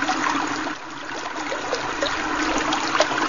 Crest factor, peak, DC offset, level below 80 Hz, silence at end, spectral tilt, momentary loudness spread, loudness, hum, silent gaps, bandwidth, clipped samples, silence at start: 20 dB; -4 dBFS; 0.7%; -48 dBFS; 0 s; -2 dB/octave; 9 LU; -24 LUFS; none; none; 7.4 kHz; under 0.1%; 0 s